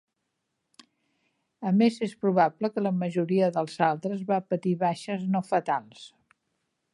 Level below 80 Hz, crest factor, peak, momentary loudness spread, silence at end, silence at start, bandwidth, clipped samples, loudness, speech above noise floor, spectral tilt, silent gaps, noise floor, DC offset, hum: -78 dBFS; 20 dB; -8 dBFS; 8 LU; 0.85 s; 1.6 s; 11 kHz; under 0.1%; -27 LUFS; 54 dB; -7.5 dB/octave; none; -80 dBFS; under 0.1%; none